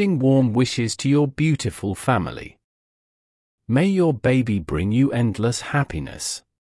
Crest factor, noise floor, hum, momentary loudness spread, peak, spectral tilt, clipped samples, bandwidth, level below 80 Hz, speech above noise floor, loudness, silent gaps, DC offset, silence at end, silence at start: 16 dB; under -90 dBFS; none; 10 LU; -6 dBFS; -6 dB/octave; under 0.1%; 12 kHz; -46 dBFS; over 70 dB; -21 LUFS; 2.64-3.58 s; under 0.1%; 0.25 s; 0 s